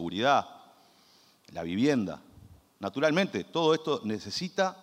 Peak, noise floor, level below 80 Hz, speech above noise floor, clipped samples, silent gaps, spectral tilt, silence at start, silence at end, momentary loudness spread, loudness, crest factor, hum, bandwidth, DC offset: -10 dBFS; -62 dBFS; -70 dBFS; 33 dB; under 0.1%; none; -5 dB/octave; 0 s; 0.05 s; 13 LU; -29 LUFS; 20 dB; none; 15.5 kHz; under 0.1%